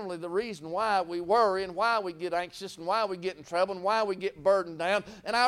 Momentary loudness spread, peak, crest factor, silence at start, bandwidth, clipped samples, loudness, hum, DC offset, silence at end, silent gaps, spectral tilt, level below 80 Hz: 7 LU; -12 dBFS; 16 dB; 0 s; 14.5 kHz; under 0.1%; -29 LUFS; none; under 0.1%; 0 s; none; -4 dB/octave; -66 dBFS